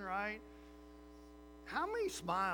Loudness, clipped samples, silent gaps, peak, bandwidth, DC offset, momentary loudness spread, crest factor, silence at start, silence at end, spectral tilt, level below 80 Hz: -40 LUFS; under 0.1%; none; -24 dBFS; over 20 kHz; under 0.1%; 20 LU; 18 dB; 0 s; 0 s; -4 dB/octave; -62 dBFS